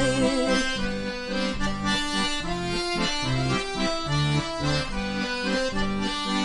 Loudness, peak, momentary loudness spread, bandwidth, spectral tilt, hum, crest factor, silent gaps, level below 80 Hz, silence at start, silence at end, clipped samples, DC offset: -26 LUFS; -10 dBFS; 5 LU; 11 kHz; -4.5 dB/octave; none; 16 dB; none; -38 dBFS; 0 s; 0 s; under 0.1%; under 0.1%